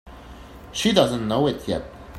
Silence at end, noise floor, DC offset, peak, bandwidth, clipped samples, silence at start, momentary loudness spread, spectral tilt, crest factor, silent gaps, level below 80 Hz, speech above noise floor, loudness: 0 s; -41 dBFS; under 0.1%; -2 dBFS; 16 kHz; under 0.1%; 0.05 s; 24 LU; -5 dB/octave; 22 dB; none; -46 dBFS; 20 dB; -22 LUFS